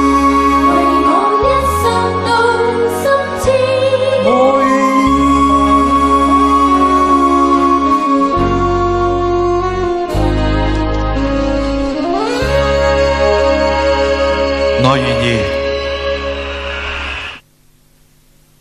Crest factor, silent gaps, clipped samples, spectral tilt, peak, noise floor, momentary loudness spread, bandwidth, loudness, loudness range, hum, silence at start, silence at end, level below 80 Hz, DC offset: 12 dB; none; under 0.1%; -6 dB/octave; 0 dBFS; -49 dBFS; 7 LU; 14.5 kHz; -12 LUFS; 5 LU; none; 0 s; 1.2 s; -24 dBFS; under 0.1%